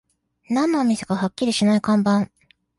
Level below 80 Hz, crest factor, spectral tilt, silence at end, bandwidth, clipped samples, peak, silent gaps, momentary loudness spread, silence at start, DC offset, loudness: -60 dBFS; 14 dB; -5.5 dB/octave; 0.55 s; 11.5 kHz; under 0.1%; -8 dBFS; none; 6 LU; 0.5 s; under 0.1%; -20 LUFS